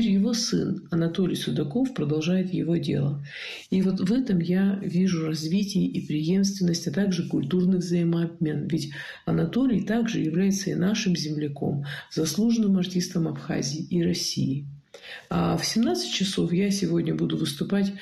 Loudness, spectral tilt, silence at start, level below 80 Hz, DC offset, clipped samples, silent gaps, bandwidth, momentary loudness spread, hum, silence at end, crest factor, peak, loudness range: -25 LUFS; -5.5 dB/octave; 0 s; -56 dBFS; under 0.1%; under 0.1%; none; 13 kHz; 6 LU; none; 0 s; 12 dB; -14 dBFS; 1 LU